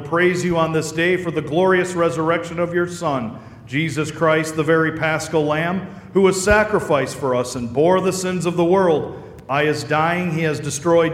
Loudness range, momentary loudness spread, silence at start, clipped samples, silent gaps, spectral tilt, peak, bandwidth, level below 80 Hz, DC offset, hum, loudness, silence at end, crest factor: 2 LU; 7 LU; 0 s; under 0.1%; none; -5.5 dB/octave; -2 dBFS; 15.5 kHz; -46 dBFS; under 0.1%; none; -19 LUFS; 0 s; 16 dB